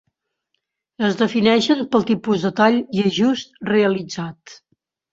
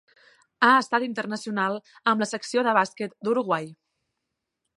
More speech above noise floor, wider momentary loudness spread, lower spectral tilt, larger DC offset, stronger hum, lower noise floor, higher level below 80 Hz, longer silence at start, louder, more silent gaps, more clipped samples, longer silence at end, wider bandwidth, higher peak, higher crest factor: about the same, 57 dB vs 58 dB; about the same, 9 LU vs 10 LU; first, -5.5 dB/octave vs -4 dB/octave; neither; neither; second, -75 dBFS vs -82 dBFS; first, -60 dBFS vs -80 dBFS; first, 1 s vs 0.6 s; first, -19 LUFS vs -24 LUFS; neither; neither; second, 0.6 s vs 1.05 s; second, 7.8 kHz vs 11.5 kHz; about the same, -2 dBFS vs -4 dBFS; about the same, 18 dB vs 22 dB